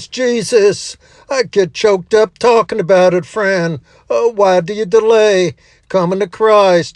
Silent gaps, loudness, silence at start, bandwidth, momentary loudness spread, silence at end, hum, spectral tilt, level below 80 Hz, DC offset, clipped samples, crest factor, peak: none; -13 LUFS; 0 s; 11 kHz; 9 LU; 0.05 s; none; -4.5 dB/octave; -54 dBFS; under 0.1%; under 0.1%; 12 dB; 0 dBFS